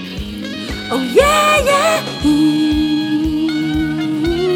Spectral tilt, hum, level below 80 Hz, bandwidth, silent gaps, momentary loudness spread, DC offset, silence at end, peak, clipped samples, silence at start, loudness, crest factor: -4.5 dB/octave; none; -32 dBFS; 17.5 kHz; none; 12 LU; under 0.1%; 0 s; 0 dBFS; under 0.1%; 0 s; -15 LUFS; 16 dB